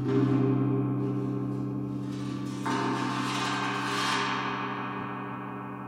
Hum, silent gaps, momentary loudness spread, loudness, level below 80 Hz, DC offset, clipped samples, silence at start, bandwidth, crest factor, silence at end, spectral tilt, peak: none; none; 9 LU; -30 LUFS; -64 dBFS; under 0.1%; under 0.1%; 0 s; 13.5 kHz; 16 dB; 0 s; -5.5 dB/octave; -14 dBFS